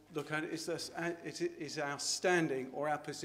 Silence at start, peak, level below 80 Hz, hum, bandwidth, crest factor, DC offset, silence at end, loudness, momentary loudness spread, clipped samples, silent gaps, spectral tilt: 0.1 s; -18 dBFS; -78 dBFS; none; 16 kHz; 20 dB; under 0.1%; 0 s; -37 LUFS; 8 LU; under 0.1%; none; -3.5 dB/octave